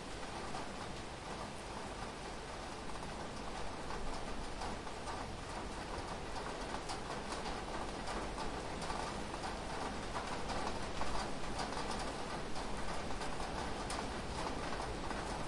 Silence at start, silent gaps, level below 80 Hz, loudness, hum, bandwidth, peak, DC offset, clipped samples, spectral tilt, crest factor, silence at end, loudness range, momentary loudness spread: 0 s; none; -50 dBFS; -43 LUFS; none; 11.5 kHz; -26 dBFS; under 0.1%; under 0.1%; -4 dB/octave; 16 dB; 0 s; 4 LU; 4 LU